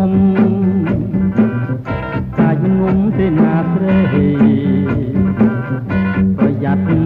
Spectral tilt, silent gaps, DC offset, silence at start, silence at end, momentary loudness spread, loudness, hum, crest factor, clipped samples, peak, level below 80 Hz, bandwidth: -11 dB/octave; none; under 0.1%; 0 s; 0 s; 7 LU; -14 LUFS; none; 12 dB; under 0.1%; -2 dBFS; -36 dBFS; 4.1 kHz